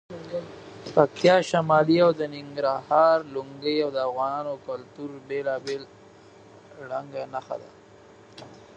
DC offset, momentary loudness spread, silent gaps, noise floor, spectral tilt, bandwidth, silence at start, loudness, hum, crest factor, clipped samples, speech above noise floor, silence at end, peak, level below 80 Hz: under 0.1%; 18 LU; none; -51 dBFS; -6 dB/octave; 9 kHz; 0.1 s; -25 LUFS; none; 24 dB; under 0.1%; 26 dB; 0.2 s; -2 dBFS; -68 dBFS